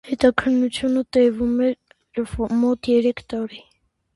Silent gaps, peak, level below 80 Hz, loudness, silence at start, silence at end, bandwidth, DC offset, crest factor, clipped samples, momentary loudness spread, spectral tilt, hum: none; 0 dBFS; -46 dBFS; -21 LUFS; 0.05 s; 0.55 s; 11.5 kHz; under 0.1%; 20 dB; under 0.1%; 11 LU; -5.5 dB/octave; none